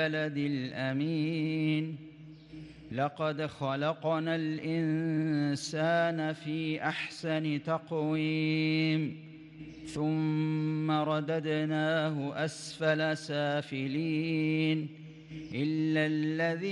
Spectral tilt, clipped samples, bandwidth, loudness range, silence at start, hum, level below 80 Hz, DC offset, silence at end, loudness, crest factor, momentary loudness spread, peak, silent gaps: -6.5 dB/octave; under 0.1%; 11 kHz; 2 LU; 0 s; none; -70 dBFS; under 0.1%; 0 s; -32 LUFS; 14 dB; 12 LU; -16 dBFS; none